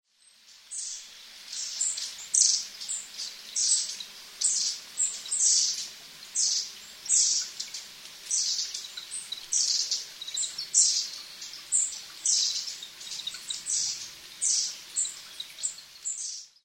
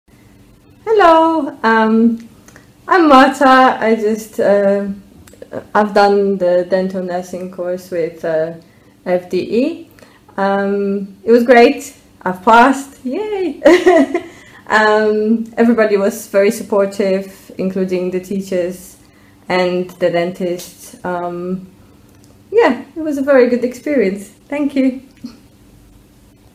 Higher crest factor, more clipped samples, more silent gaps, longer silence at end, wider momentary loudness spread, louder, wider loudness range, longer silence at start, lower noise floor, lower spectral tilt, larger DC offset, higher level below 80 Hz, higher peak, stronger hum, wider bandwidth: first, 24 dB vs 14 dB; second, under 0.1% vs 0.4%; neither; second, 0.2 s vs 1.25 s; about the same, 17 LU vs 16 LU; second, -27 LUFS vs -14 LUFS; second, 4 LU vs 8 LU; second, 0.5 s vs 0.85 s; first, -58 dBFS vs -46 dBFS; second, 4 dB/octave vs -5.5 dB/octave; neither; second, -76 dBFS vs -52 dBFS; second, -8 dBFS vs 0 dBFS; neither; about the same, 16.5 kHz vs 16 kHz